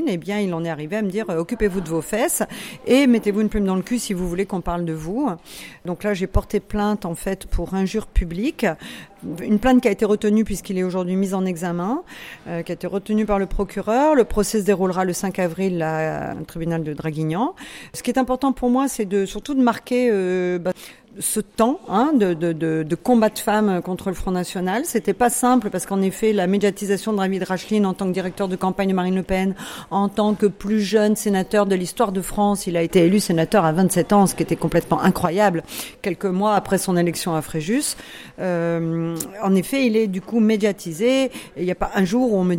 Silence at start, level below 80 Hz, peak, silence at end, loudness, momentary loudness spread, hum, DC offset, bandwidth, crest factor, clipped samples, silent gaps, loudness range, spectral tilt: 0 s; -38 dBFS; -4 dBFS; 0 s; -21 LUFS; 9 LU; none; under 0.1%; 16.5 kHz; 16 dB; under 0.1%; none; 5 LU; -5.5 dB/octave